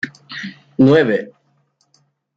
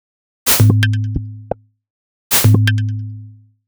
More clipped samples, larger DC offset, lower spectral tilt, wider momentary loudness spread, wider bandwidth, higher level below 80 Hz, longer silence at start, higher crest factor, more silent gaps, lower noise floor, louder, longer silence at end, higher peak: neither; neither; first, -7.5 dB/octave vs -4.5 dB/octave; about the same, 18 LU vs 18 LU; second, 7.4 kHz vs over 20 kHz; second, -62 dBFS vs -38 dBFS; second, 0.05 s vs 0.45 s; about the same, 16 dB vs 16 dB; second, none vs 1.90-2.30 s; first, -62 dBFS vs -38 dBFS; about the same, -15 LUFS vs -14 LUFS; first, 1.1 s vs 0.35 s; about the same, -2 dBFS vs 0 dBFS